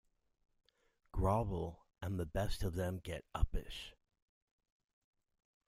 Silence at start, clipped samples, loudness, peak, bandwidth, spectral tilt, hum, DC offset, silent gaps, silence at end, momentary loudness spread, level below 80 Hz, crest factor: 1.15 s; under 0.1%; -41 LUFS; -18 dBFS; 15.5 kHz; -6.5 dB/octave; none; under 0.1%; none; 1.75 s; 13 LU; -48 dBFS; 22 dB